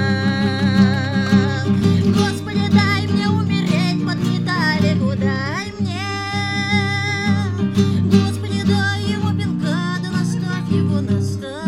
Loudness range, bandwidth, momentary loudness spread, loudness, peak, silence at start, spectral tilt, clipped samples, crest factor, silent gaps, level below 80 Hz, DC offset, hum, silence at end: 3 LU; 12.5 kHz; 6 LU; -18 LUFS; -2 dBFS; 0 s; -6.5 dB/octave; under 0.1%; 16 dB; none; -48 dBFS; under 0.1%; none; 0 s